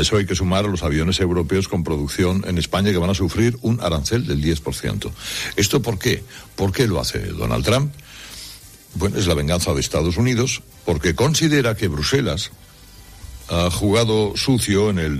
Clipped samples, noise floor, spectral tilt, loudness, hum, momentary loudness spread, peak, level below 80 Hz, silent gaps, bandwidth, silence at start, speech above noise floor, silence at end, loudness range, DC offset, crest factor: under 0.1%; -43 dBFS; -5 dB/octave; -20 LUFS; none; 9 LU; -4 dBFS; -36 dBFS; none; 15 kHz; 0 s; 24 dB; 0 s; 3 LU; under 0.1%; 16 dB